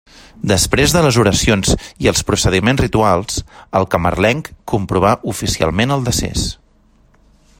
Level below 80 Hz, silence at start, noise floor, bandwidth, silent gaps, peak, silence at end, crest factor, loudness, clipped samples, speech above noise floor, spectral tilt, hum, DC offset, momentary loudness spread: -30 dBFS; 0.35 s; -52 dBFS; 16.5 kHz; none; 0 dBFS; 1.05 s; 16 dB; -15 LUFS; under 0.1%; 37 dB; -4.5 dB/octave; none; under 0.1%; 9 LU